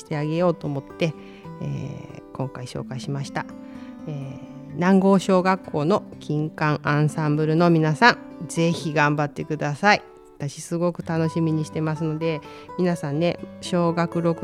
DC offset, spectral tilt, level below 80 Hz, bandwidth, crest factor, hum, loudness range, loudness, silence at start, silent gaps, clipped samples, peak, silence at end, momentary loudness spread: under 0.1%; -6.5 dB/octave; -58 dBFS; 12.5 kHz; 22 dB; none; 10 LU; -23 LUFS; 0 s; none; under 0.1%; -2 dBFS; 0 s; 16 LU